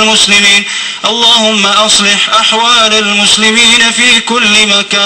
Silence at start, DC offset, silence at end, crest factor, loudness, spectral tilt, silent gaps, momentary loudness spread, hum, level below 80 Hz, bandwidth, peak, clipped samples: 0 s; 0.2%; 0 s; 8 dB; -5 LUFS; -0.5 dB/octave; none; 3 LU; none; -44 dBFS; 17 kHz; 0 dBFS; 0.1%